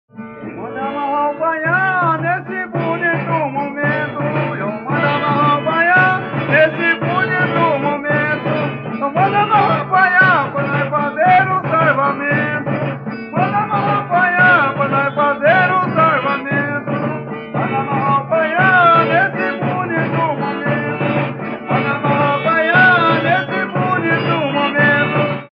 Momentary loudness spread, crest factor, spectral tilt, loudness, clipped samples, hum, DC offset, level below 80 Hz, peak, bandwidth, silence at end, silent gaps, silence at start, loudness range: 10 LU; 14 dB; -9 dB/octave; -15 LUFS; under 0.1%; none; under 0.1%; -58 dBFS; -2 dBFS; 5.4 kHz; 0.1 s; none; 0.15 s; 4 LU